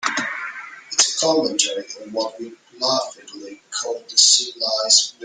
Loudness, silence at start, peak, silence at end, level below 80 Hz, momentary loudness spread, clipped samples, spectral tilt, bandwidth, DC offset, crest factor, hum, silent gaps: -18 LUFS; 0 s; 0 dBFS; 0 s; -72 dBFS; 22 LU; under 0.1%; 0.5 dB/octave; 12 kHz; under 0.1%; 22 dB; none; none